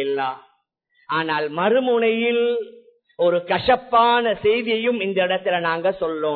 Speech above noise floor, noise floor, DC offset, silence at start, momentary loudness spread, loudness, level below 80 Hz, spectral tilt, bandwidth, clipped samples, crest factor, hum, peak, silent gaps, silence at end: 46 dB; -66 dBFS; under 0.1%; 0 s; 8 LU; -20 LUFS; -56 dBFS; -8 dB/octave; 4.5 kHz; under 0.1%; 16 dB; none; -4 dBFS; none; 0 s